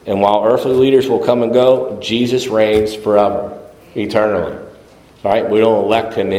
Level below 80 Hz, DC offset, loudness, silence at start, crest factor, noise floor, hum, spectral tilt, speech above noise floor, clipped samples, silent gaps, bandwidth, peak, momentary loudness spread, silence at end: -48 dBFS; under 0.1%; -14 LUFS; 0.05 s; 14 dB; -43 dBFS; none; -6 dB/octave; 29 dB; under 0.1%; none; 15.5 kHz; 0 dBFS; 11 LU; 0 s